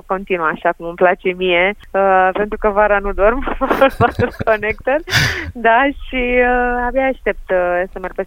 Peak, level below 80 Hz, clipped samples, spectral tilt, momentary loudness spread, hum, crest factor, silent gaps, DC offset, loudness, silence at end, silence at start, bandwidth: 0 dBFS; -30 dBFS; under 0.1%; -5 dB/octave; 6 LU; none; 16 dB; none; under 0.1%; -16 LUFS; 0 s; 0.1 s; 16.5 kHz